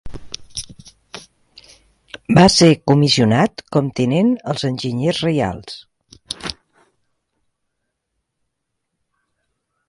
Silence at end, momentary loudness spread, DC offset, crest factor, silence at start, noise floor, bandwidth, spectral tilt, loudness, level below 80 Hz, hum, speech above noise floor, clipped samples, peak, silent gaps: 3.35 s; 23 LU; under 0.1%; 20 dB; 0.05 s; -75 dBFS; 11.5 kHz; -5.5 dB/octave; -16 LUFS; -46 dBFS; none; 60 dB; under 0.1%; 0 dBFS; none